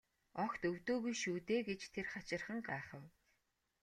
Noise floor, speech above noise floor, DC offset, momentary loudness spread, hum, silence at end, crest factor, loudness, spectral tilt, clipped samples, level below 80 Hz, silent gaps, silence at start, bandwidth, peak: -83 dBFS; 41 dB; under 0.1%; 8 LU; none; 0.75 s; 18 dB; -42 LUFS; -4.5 dB/octave; under 0.1%; -74 dBFS; none; 0.35 s; 13.5 kHz; -26 dBFS